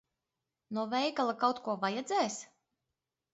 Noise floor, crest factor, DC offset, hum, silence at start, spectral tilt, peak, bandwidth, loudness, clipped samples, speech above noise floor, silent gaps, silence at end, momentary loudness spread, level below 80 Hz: -88 dBFS; 20 dB; under 0.1%; none; 0.7 s; -2.5 dB/octave; -16 dBFS; 8 kHz; -33 LUFS; under 0.1%; 56 dB; none; 0.9 s; 8 LU; -84 dBFS